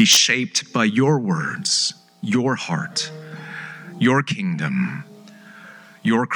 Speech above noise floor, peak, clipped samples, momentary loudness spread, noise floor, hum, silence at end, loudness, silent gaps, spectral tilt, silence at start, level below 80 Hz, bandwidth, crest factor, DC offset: 24 dB; -2 dBFS; under 0.1%; 16 LU; -44 dBFS; none; 0 s; -20 LUFS; none; -3.5 dB/octave; 0 s; -80 dBFS; over 20 kHz; 20 dB; under 0.1%